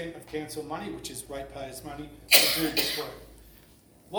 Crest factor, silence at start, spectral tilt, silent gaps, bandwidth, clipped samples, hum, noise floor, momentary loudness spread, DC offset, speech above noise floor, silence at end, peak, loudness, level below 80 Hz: 28 dB; 0 s; -1.5 dB/octave; none; over 20 kHz; under 0.1%; none; -56 dBFS; 22 LU; under 0.1%; 27 dB; 0 s; -2 dBFS; -24 LUFS; -56 dBFS